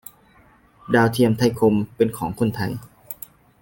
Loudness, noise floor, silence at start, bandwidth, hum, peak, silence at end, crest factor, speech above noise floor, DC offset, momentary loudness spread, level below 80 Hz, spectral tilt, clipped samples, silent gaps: -20 LUFS; -54 dBFS; 0.9 s; 17 kHz; none; -4 dBFS; 0.5 s; 18 dB; 34 dB; under 0.1%; 17 LU; -52 dBFS; -6.5 dB/octave; under 0.1%; none